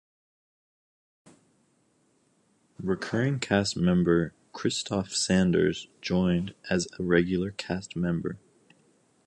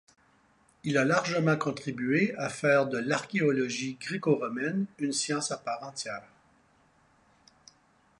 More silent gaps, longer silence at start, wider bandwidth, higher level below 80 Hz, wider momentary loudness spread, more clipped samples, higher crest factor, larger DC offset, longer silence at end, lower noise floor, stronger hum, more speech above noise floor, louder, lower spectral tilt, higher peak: neither; first, 2.8 s vs 0.85 s; about the same, 11 kHz vs 11 kHz; first, -52 dBFS vs -72 dBFS; about the same, 10 LU vs 10 LU; neither; about the same, 20 dB vs 20 dB; neither; second, 0.9 s vs 2 s; about the same, -68 dBFS vs -65 dBFS; neither; first, 42 dB vs 36 dB; about the same, -27 LUFS vs -29 LUFS; about the same, -5.5 dB/octave vs -4.5 dB/octave; first, -8 dBFS vs -12 dBFS